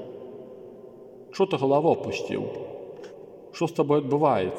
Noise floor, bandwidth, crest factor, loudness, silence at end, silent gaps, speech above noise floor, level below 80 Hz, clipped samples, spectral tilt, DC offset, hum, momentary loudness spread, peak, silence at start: -46 dBFS; 12 kHz; 18 dB; -25 LUFS; 0 s; none; 22 dB; -70 dBFS; under 0.1%; -7 dB/octave; under 0.1%; none; 23 LU; -8 dBFS; 0 s